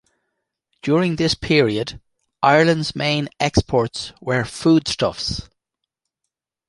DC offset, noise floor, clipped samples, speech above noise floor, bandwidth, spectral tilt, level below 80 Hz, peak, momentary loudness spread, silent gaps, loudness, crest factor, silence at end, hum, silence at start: under 0.1%; -81 dBFS; under 0.1%; 63 dB; 11.5 kHz; -5 dB/octave; -42 dBFS; -2 dBFS; 10 LU; none; -19 LUFS; 20 dB; 1.25 s; none; 0.85 s